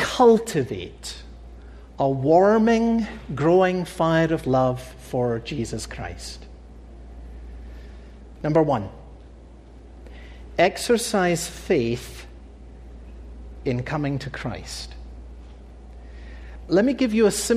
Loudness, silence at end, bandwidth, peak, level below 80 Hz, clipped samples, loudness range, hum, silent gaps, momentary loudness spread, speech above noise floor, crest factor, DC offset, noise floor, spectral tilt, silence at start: -22 LUFS; 0 s; 15 kHz; -6 dBFS; -42 dBFS; under 0.1%; 11 LU; none; none; 25 LU; 23 dB; 18 dB; under 0.1%; -44 dBFS; -5.5 dB/octave; 0 s